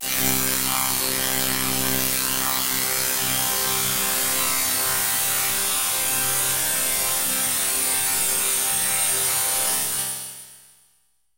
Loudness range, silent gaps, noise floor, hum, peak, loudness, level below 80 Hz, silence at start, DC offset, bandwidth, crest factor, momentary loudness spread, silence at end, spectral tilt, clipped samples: 1 LU; none; -66 dBFS; none; -4 dBFS; -20 LUFS; -52 dBFS; 0 s; under 0.1%; 16 kHz; 20 dB; 2 LU; 0.8 s; -0.5 dB/octave; under 0.1%